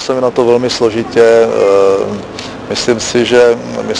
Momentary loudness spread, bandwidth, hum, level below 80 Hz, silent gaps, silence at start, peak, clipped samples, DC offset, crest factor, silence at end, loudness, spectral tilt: 11 LU; 10.5 kHz; none; -44 dBFS; none; 0 s; 0 dBFS; 0.2%; under 0.1%; 10 dB; 0 s; -11 LUFS; -4 dB/octave